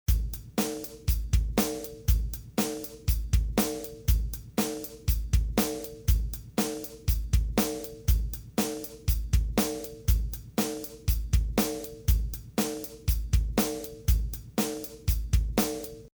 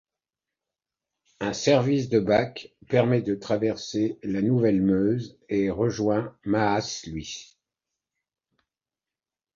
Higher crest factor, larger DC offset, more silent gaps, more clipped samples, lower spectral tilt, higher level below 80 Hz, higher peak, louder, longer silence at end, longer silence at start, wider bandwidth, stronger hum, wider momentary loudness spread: about the same, 16 dB vs 20 dB; neither; neither; neither; about the same, -5 dB/octave vs -6 dB/octave; first, -30 dBFS vs -56 dBFS; second, -12 dBFS vs -6 dBFS; second, -30 LUFS vs -25 LUFS; second, 0.05 s vs 2.1 s; second, 0.1 s vs 1.4 s; first, over 20 kHz vs 7.6 kHz; neither; second, 5 LU vs 11 LU